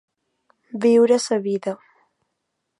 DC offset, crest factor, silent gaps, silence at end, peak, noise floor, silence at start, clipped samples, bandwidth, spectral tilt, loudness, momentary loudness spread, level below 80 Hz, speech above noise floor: under 0.1%; 16 dB; none; 1.05 s; -6 dBFS; -77 dBFS; 0.75 s; under 0.1%; 11.5 kHz; -5 dB/octave; -19 LUFS; 19 LU; -78 dBFS; 59 dB